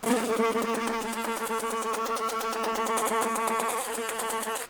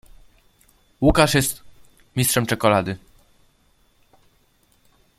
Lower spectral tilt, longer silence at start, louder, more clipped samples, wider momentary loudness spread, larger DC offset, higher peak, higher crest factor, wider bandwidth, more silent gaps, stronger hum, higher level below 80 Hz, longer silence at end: second, -2.5 dB/octave vs -4.5 dB/octave; second, 0 s vs 1 s; second, -28 LUFS vs -20 LUFS; neither; second, 4 LU vs 14 LU; neither; second, -10 dBFS vs 0 dBFS; second, 18 dB vs 24 dB; first, over 20 kHz vs 16.5 kHz; neither; neither; second, -64 dBFS vs -38 dBFS; second, 0 s vs 2.2 s